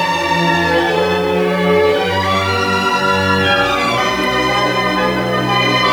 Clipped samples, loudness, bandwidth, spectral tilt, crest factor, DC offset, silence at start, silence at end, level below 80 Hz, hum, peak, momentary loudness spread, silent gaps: under 0.1%; -14 LUFS; over 20 kHz; -4.5 dB/octave; 14 dB; under 0.1%; 0 s; 0 s; -42 dBFS; none; -2 dBFS; 2 LU; none